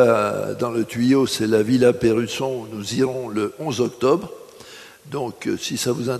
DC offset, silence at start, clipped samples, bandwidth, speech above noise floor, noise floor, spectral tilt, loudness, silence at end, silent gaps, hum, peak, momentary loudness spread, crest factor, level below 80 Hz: under 0.1%; 0 s; under 0.1%; 13.5 kHz; 22 dB; -42 dBFS; -5 dB/octave; -21 LUFS; 0 s; none; none; -2 dBFS; 17 LU; 18 dB; -56 dBFS